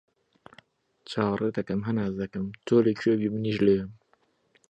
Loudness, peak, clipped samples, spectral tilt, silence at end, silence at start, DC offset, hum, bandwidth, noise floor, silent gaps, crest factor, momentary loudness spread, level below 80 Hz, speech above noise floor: -27 LUFS; -8 dBFS; under 0.1%; -8 dB/octave; 0.8 s; 1.1 s; under 0.1%; none; 8.8 kHz; -68 dBFS; none; 20 dB; 10 LU; -58 dBFS; 42 dB